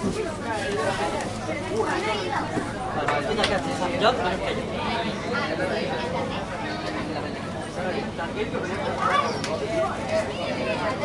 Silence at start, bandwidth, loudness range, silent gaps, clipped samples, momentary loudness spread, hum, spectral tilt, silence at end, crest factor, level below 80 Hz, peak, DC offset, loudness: 0 s; 11.5 kHz; 3 LU; none; under 0.1%; 7 LU; none; -5 dB/octave; 0 s; 20 dB; -46 dBFS; -6 dBFS; under 0.1%; -26 LUFS